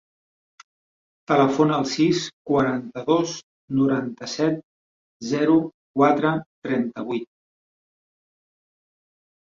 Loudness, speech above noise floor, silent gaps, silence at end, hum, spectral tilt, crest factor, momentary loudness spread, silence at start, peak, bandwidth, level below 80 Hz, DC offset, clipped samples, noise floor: -22 LUFS; over 69 dB; 2.33-2.45 s, 3.43-3.68 s, 4.63-5.20 s, 5.74-5.94 s, 6.46-6.62 s; 2.3 s; none; -6 dB/octave; 20 dB; 11 LU; 1.3 s; -4 dBFS; 7.6 kHz; -64 dBFS; under 0.1%; under 0.1%; under -90 dBFS